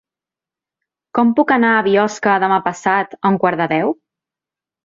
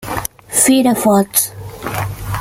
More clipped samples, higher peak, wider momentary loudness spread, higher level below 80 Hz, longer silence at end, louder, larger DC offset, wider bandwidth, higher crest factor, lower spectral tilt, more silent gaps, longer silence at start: neither; about the same, -2 dBFS vs 0 dBFS; second, 6 LU vs 13 LU; second, -62 dBFS vs -38 dBFS; first, 0.95 s vs 0 s; about the same, -16 LUFS vs -14 LUFS; neither; second, 7.6 kHz vs 17 kHz; about the same, 16 dB vs 16 dB; first, -6 dB/octave vs -4 dB/octave; neither; first, 1.15 s vs 0 s